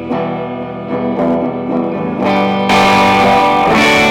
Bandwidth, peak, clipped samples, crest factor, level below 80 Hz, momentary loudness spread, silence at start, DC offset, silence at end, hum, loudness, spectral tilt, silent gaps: 19.5 kHz; -6 dBFS; under 0.1%; 6 dB; -40 dBFS; 11 LU; 0 s; under 0.1%; 0 s; none; -12 LUFS; -5 dB/octave; none